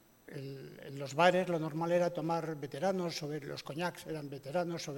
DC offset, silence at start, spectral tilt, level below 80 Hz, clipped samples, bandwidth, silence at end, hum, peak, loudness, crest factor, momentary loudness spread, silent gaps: under 0.1%; 0.25 s; -5.5 dB/octave; -74 dBFS; under 0.1%; 17 kHz; 0 s; none; -10 dBFS; -35 LUFS; 24 dB; 17 LU; none